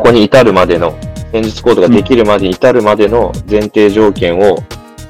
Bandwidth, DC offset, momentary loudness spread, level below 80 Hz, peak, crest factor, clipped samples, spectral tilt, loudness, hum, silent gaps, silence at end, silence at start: 15 kHz; under 0.1%; 10 LU; -30 dBFS; 0 dBFS; 8 dB; 2%; -6.5 dB/octave; -9 LUFS; none; none; 0 s; 0 s